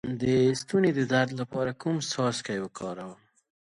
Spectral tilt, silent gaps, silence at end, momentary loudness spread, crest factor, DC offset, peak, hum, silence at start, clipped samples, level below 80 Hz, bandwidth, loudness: -5.5 dB/octave; none; 0.55 s; 13 LU; 18 dB; under 0.1%; -10 dBFS; none; 0.05 s; under 0.1%; -62 dBFS; 11.5 kHz; -28 LUFS